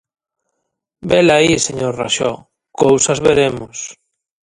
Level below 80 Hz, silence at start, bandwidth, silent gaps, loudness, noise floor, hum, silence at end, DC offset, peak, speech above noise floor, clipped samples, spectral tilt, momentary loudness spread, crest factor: -46 dBFS; 1.05 s; 11.5 kHz; none; -14 LUFS; -73 dBFS; none; 0.65 s; under 0.1%; 0 dBFS; 59 dB; under 0.1%; -3.5 dB/octave; 17 LU; 16 dB